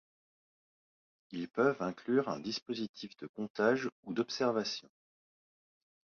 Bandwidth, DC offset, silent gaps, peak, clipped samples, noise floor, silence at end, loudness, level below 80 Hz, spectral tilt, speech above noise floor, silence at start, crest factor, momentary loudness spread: 7 kHz; under 0.1%; 2.62-2.66 s, 2.89-2.94 s, 3.29-3.34 s, 3.50-3.55 s, 3.92-4.03 s; -16 dBFS; under 0.1%; under -90 dBFS; 1.3 s; -35 LUFS; -78 dBFS; -5 dB/octave; over 55 dB; 1.3 s; 20 dB; 12 LU